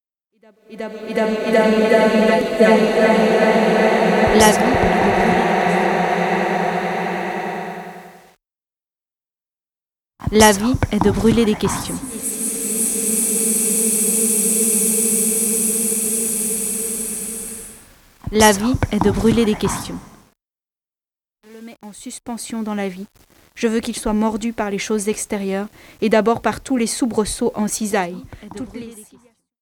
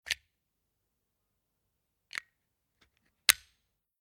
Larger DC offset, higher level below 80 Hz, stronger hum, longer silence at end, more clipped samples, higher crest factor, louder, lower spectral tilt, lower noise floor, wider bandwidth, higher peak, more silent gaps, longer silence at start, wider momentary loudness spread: neither; first, -40 dBFS vs -72 dBFS; neither; about the same, 0.6 s vs 0.65 s; neither; second, 18 dB vs 38 dB; first, -17 LUFS vs -29 LUFS; first, -3.5 dB/octave vs 3 dB/octave; first, under -90 dBFS vs -82 dBFS; about the same, 19 kHz vs 19.5 kHz; about the same, 0 dBFS vs 0 dBFS; neither; first, 0.7 s vs 0.05 s; about the same, 17 LU vs 16 LU